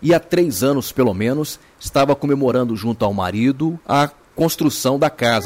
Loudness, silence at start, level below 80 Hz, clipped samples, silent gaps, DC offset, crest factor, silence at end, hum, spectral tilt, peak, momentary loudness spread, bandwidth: -18 LUFS; 0 s; -48 dBFS; under 0.1%; none; under 0.1%; 12 dB; 0 s; none; -5.5 dB/octave; -6 dBFS; 5 LU; 16.5 kHz